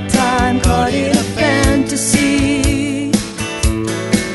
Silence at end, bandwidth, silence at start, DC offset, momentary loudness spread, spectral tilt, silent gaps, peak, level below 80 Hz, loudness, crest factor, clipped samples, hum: 0 s; 12 kHz; 0 s; under 0.1%; 5 LU; -4.5 dB/octave; none; 0 dBFS; -24 dBFS; -15 LUFS; 14 dB; under 0.1%; none